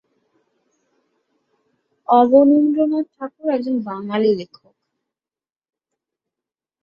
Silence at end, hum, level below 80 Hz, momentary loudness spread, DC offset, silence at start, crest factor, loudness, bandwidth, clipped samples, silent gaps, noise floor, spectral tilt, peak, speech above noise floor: 2.4 s; none; -66 dBFS; 15 LU; under 0.1%; 2.1 s; 18 dB; -17 LUFS; 5.6 kHz; under 0.1%; none; under -90 dBFS; -8.5 dB/octave; -2 dBFS; over 74 dB